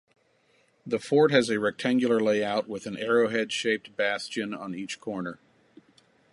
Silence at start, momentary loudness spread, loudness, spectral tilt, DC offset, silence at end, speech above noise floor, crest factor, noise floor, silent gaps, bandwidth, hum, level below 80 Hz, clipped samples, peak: 0.85 s; 13 LU; -27 LUFS; -4.5 dB/octave; under 0.1%; 1 s; 40 dB; 20 dB; -66 dBFS; none; 11.5 kHz; none; -72 dBFS; under 0.1%; -6 dBFS